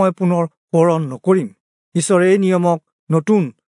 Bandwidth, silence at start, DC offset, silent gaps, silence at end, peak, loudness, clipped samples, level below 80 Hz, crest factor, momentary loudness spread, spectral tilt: 11 kHz; 0 s; under 0.1%; 0.57-0.68 s, 1.60-1.92 s, 2.92-3.07 s; 0.25 s; -2 dBFS; -17 LUFS; under 0.1%; -72 dBFS; 14 dB; 8 LU; -6.5 dB/octave